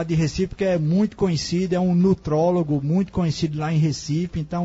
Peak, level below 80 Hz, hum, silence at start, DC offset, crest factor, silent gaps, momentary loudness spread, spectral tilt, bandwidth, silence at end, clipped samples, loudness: -8 dBFS; -44 dBFS; none; 0 s; under 0.1%; 14 dB; none; 5 LU; -7 dB/octave; 8 kHz; 0 s; under 0.1%; -22 LUFS